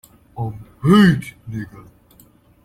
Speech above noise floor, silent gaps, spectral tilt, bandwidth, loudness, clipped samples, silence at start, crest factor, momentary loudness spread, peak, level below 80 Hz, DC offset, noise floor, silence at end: 35 dB; none; -7 dB/octave; 14.5 kHz; -17 LUFS; under 0.1%; 0.35 s; 18 dB; 21 LU; -2 dBFS; -48 dBFS; under 0.1%; -51 dBFS; 0.85 s